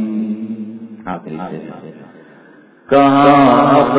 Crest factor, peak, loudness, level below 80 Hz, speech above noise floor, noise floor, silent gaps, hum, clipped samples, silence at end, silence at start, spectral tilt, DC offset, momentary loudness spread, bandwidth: 14 dB; 0 dBFS; -11 LUFS; -52 dBFS; 33 dB; -44 dBFS; none; none; 0.1%; 0 s; 0 s; -10.5 dB/octave; under 0.1%; 21 LU; 4 kHz